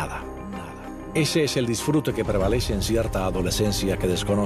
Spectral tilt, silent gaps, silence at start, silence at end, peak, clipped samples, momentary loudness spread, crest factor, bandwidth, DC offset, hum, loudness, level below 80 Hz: -5 dB/octave; none; 0 s; 0 s; -10 dBFS; under 0.1%; 13 LU; 14 dB; 14.5 kHz; under 0.1%; none; -24 LUFS; -34 dBFS